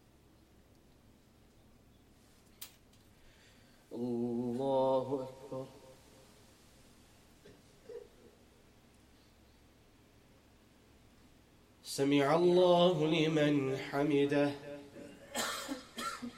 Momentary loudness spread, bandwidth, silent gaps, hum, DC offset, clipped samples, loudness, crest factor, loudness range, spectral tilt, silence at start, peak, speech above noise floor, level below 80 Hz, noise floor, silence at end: 23 LU; 16.5 kHz; none; none; under 0.1%; under 0.1%; -33 LUFS; 20 dB; 17 LU; -5.5 dB/octave; 2.6 s; -16 dBFS; 34 dB; -70 dBFS; -64 dBFS; 0 s